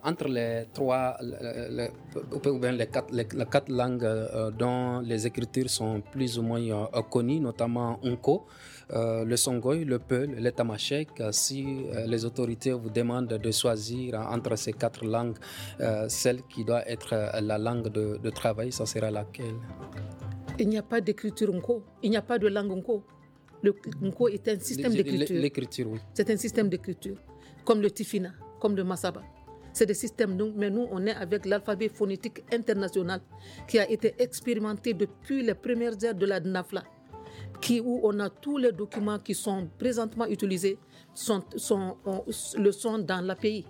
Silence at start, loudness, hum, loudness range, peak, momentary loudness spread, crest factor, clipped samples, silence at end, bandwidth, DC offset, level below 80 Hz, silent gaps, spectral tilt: 0 s; -30 LUFS; none; 2 LU; -8 dBFS; 9 LU; 20 dB; under 0.1%; 0 s; over 20 kHz; under 0.1%; -60 dBFS; none; -5 dB/octave